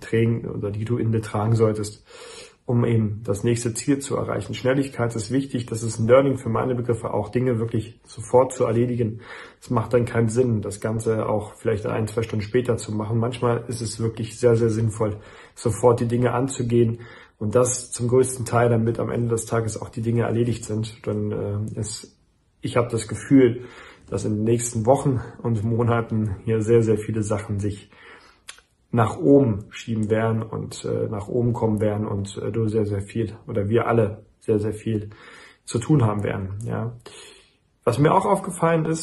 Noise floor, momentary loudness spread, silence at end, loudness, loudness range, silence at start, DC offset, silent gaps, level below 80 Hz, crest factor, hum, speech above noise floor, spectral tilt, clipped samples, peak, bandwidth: -57 dBFS; 11 LU; 0 s; -23 LUFS; 3 LU; 0 s; under 0.1%; none; -52 dBFS; 20 dB; none; 35 dB; -6.5 dB/octave; under 0.1%; -4 dBFS; 12 kHz